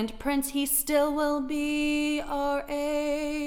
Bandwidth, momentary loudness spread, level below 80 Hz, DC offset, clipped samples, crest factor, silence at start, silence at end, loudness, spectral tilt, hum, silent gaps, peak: 18.5 kHz; 5 LU; -46 dBFS; under 0.1%; under 0.1%; 16 dB; 0 s; 0 s; -27 LUFS; -2.5 dB/octave; none; none; -10 dBFS